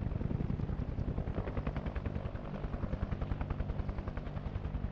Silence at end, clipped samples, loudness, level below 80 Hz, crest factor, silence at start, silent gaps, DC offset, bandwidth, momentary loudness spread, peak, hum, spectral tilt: 0 s; under 0.1%; -39 LUFS; -40 dBFS; 16 dB; 0 s; none; under 0.1%; 6.2 kHz; 5 LU; -22 dBFS; none; -9.5 dB/octave